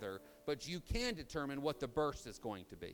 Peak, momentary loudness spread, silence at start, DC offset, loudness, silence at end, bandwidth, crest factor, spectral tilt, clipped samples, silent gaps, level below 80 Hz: -24 dBFS; 9 LU; 0 s; under 0.1%; -42 LUFS; 0 s; over 20 kHz; 18 dB; -4.5 dB/octave; under 0.1%; none; -54 dBFS